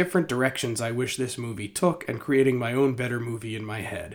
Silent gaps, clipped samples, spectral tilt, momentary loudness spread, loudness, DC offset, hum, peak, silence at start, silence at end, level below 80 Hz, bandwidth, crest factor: none; under 0.1%; -5 dB/octave; 10 LU; -26 LUFS; under 0.1%; none; -6 dBFS; 0 s; 0 s; -60 dBFS; 19.5 kHz; 20 dB